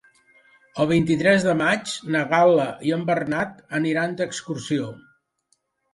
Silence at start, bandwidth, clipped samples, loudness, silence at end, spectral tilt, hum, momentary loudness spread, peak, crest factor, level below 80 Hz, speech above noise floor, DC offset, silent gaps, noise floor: 0.75 s; 11.5 kHz; under 0.1%; -22 LUFS; 0.95 s; -5.5 dB/octave; none; 9 LU; -4 dBFS; 20 dB; -58 dBFS; 48 dB; under 0.1%; none; -69 dBFS